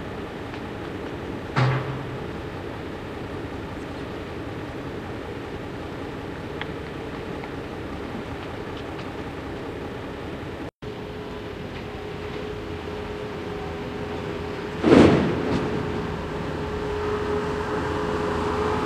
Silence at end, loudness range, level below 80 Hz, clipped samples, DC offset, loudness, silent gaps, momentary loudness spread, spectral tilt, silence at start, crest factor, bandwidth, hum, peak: 0 s; 11 LU; -44 dBFS; under 0.1%; under 0.1%; -28 LUFS; 10.75-10.81 s; 10 LU; -7 dB/octave; 0 s; 28 dB; 15 kHz; none; 0 dBFS